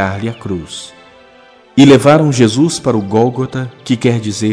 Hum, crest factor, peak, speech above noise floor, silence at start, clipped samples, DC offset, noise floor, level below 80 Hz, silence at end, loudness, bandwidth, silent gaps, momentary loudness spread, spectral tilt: none; 12 dB; 0 dBFS; 31 dB; 0 s; 1%; under 0.1%; -43 dBFS; -48 dBFS; 0 s; -12 LUFS; 11 kHz; none; 16 LU; -6 dB/octave